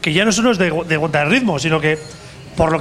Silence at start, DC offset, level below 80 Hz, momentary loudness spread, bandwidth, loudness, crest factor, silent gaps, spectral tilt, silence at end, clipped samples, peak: 0 s; under 0.1%; -40 dBFS; 13 LU; 13.5 kHz; -16 LUFS; 16 dB; none; -4.5 dB/octave; 0 s; under 0.1%; 0 dBFS